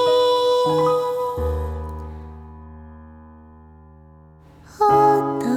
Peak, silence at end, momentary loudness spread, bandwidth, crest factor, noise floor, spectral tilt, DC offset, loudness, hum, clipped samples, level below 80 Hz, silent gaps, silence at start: -6 dBFS; 0 s; 25 LU; 16.5 kHz; 16 dB; -47 dBFS; -6 dB/octave; under 0.1%; -19 LUFS; none; under 0.1%; -36 dBFS; none; 0 s